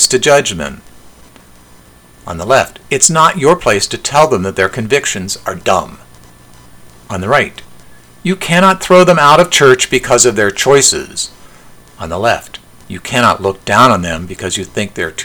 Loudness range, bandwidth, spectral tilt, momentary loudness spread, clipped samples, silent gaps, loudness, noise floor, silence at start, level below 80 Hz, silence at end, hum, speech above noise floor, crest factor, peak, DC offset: 8 LU; over 20 kHz; -3 dB/octave; 15 LU; 0.8%; none; -11 LUFS; -41 dBFS; 0 s; -42 dBFS; 0 s; none; 30 dB; 12 dB; 0 dBFS; under 0.1%